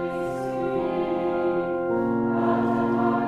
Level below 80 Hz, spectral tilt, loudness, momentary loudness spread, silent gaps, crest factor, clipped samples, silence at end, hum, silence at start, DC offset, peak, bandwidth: -56 dBFS; -8.5 dB/octave; -25 LUFS; 5 LU; none; 14 dB; under 0.1%; 0 s; none; 0 s; under 0.1%; -10 dBFS; 9.8 kHz